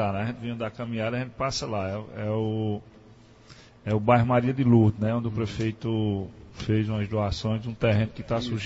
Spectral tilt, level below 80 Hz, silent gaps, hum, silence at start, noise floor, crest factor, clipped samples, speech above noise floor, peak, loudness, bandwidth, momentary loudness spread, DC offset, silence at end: -7 dB/octave; -48 dBFS; none; none; 0 s; -52 dBFS; 20 dB; under 0.1%; 26 dB; -6 dBFS; -27 LUFS; 8 kHz; 12 LU; under 0.1%; 0 s